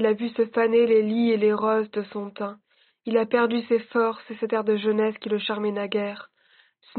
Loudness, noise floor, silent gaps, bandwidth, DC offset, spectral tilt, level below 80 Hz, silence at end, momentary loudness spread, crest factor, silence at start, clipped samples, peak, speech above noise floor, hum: -24 LUFS; -61 dBFS; none; 4.5 kHz; under 0.1%; -4 dB/octave; -74 dBFS; 0 s; 13 LU; 16 dB; 0 s; under 0.1%; -8 dBFS; 38 dB; none